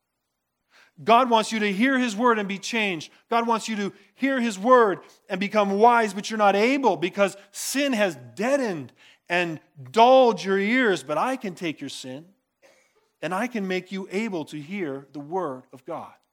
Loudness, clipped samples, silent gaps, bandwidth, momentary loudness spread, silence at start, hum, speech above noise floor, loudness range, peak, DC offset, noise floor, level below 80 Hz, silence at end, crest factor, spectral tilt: -23 LUFS; under 0.1%; none; 18 kHz; 16 LU; 1 s; none; 56 dB; 9 LU; -4 dBFS; under 0.1%; -79 dBFS; -86 dBFS; 0.25 s; 20 dB; -4.5 dB/octave